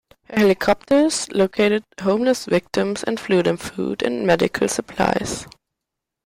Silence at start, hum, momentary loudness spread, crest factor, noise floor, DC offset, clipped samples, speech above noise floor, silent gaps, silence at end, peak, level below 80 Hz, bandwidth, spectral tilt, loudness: 0.3 s; none; 8 LU; 16 dB; -83 dBFS; under 0.1%; under 0.1%; 63 dB; none; 0.75 s; -4 dBFS; -50 dBFS; 16 kHz; -4.5 dB/octave; -20 LUFS